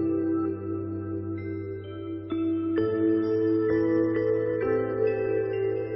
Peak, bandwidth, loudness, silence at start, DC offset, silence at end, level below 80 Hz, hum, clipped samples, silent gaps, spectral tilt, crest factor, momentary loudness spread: -14 dBFS; 5.8 kHz; -27 LUFS; 0 s; under 0.1%; 0 s; -58 dBFS; none; under 0.1%; none; -12 dB/octave; 12 dB; 10 LU